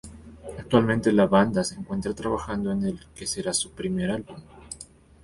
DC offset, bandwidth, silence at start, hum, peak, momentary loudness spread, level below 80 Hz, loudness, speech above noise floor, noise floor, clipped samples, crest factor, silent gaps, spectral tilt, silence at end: under 0.1%; 11.5 kHz; 0.05 s; none; -6 dBFS; 21 LU; -50 dBFS; -25 LUFS; 24 dB; -48 dBFS; under 0.1%; 20 dB; none; -5 dB/octave; 0.4 s